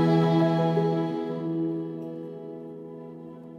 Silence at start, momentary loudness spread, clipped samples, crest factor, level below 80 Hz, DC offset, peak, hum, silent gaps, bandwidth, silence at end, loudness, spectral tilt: 0 s; 19 LU; under 0.1%; 16 dB; -74 dBFS; under 0.1%; -12 dBFS; none; none; 6.4 kHz; 0 s; -26 LUFS; -9 dB/octave